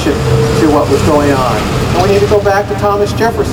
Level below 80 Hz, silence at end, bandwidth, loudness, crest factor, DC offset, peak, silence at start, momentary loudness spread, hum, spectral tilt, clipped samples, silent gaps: -24 dBFS; 0 s; 16 kHz; -11 LUFS; 10 dB; under 0.1%; 0 dBFS; 0 s; 3 LU; none; -6 dB/octave; under 0.1%; none